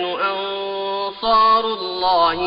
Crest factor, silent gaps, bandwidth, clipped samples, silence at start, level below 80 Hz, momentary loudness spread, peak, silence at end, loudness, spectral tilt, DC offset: 12 dB; none; 5.4 kHz; under 0.1%; 0 s; -50 dBFS; 10 LU; -6 dBFS; 0 s; -19 LUFS; -5.5 dB/octave; under 0.1%